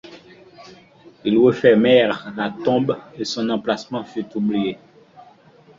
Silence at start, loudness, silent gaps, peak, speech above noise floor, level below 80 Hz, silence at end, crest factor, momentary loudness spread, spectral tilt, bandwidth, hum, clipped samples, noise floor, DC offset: 0.05 s; -19 LUFS; none; -2 dBFS; 31 dB; -60 dBFS; 1.05 s; 18 dB; 14 LU; -6 dB/octave; 7.6 kHz; none; under 0.1%; -50 dBFS; under 0.1%